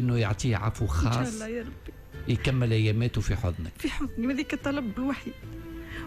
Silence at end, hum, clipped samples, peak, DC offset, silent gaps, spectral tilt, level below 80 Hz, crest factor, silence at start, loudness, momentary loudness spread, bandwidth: 0 s; none; under 0.1%; -16 dBFS; under 0.1%; none; -6.5 dB/octave; -38 dBFS; 12 dB; 0 s; -29 LUFS; 15 LU; 13.5 kHz